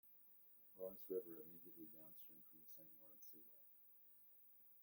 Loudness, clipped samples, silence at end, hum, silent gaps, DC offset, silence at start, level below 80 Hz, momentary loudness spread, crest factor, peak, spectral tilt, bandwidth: -57 LUFS; under 0.1%; 0 s; none; none; under 0.1%; 0.05 s; under -90 dBFS; 14 LU; 22 dB; -36 dBFS; -6 dB/octave; 17 kHz